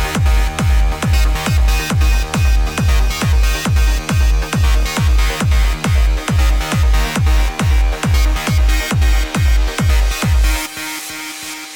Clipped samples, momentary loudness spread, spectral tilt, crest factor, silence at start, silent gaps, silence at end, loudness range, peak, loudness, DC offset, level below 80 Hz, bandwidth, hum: under 0.1%; 1 LU; -4.5 dB/octave; 10 dB; 0 s; none; 0 s; 0 LU; -4 dBFS; -16 LUFS; under 0.1%; -14 dBFS; 18 kHz; none